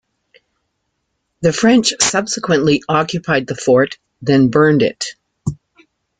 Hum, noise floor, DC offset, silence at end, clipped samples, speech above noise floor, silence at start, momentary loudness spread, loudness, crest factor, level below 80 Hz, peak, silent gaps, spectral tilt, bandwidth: none; -71 dBFS; under 0.1%; 0.65 s; under 0.1%; 57 dB; 1.4 s; 14 LU; -15 LUFS; 16 dB; -50 dBFS; 0 dBFS; none; -4.5 dB/octave; 9.6 kHz